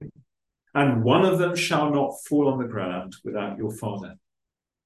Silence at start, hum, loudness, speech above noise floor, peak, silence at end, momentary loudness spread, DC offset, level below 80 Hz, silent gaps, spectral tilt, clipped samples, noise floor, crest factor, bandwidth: 0 s; none; -24 LUFS; 62 dB; -4 dBFS; 0.75 s; 14 LU; under 0.1%; -62 dBFS; none; -6 dB/octave; under 0.1%; -86 dBFS; 20 dB; 12.5 kHz